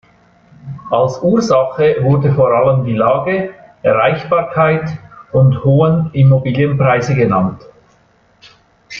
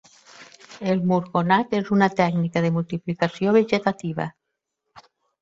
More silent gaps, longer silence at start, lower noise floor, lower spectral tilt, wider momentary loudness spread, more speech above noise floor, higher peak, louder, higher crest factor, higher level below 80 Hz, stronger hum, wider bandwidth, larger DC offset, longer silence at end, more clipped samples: neither; first, 0.65 s vs 0.4 s; second, -52 dBFS vs -80 dBFS; about the same, -8 dB/octave vs -7.5 dB/octave; about the same, 8 LU vs 10 LU; second, 40 dB vs 58 dB; about the same, -2 dBFS vs -4 dBFS; first, -13 LUFS vs -22 LUFS; second, 12 dB vs 20 dB; first, -46 dBFS vs -62 dBFS; neither; second, 7 kHz vs 7.8 kHz; neither; second, 0 s vs 0.4 s; neither